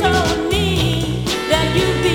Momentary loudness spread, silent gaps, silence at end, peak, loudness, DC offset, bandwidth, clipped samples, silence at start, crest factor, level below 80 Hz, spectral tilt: 4 LU; none; 0 s; 0 dBFS; -17 LUFS; under 0.1%; 18.5 kHz; under 0.1%; 0 s; 16 dB; -30 dBFS; -5 dB/octave